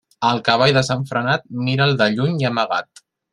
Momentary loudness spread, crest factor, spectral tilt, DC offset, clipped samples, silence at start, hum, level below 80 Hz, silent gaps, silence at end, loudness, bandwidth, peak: 6 LU; 18 dB; -5.5 dB/octave; under 0.1%; under 0.1%; 0.2 s; none; -56 dBFS; none; 0.5 s; -18 LUFS; 11 kHz; -2 dBFS